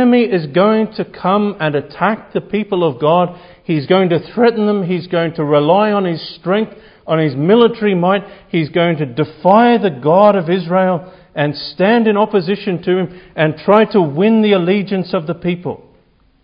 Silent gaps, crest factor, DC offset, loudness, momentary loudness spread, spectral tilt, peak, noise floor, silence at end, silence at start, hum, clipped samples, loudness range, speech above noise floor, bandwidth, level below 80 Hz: none; 14 dB; under 0.1%; -14 LUFS; 9 LU; -10.5 dB/octave; 0 dBFS; -52 dBFS; 0.65 s; 0 s; none; under 0.1%; 3 LU; 39 dB; 5.4 kHz; -54 dBFS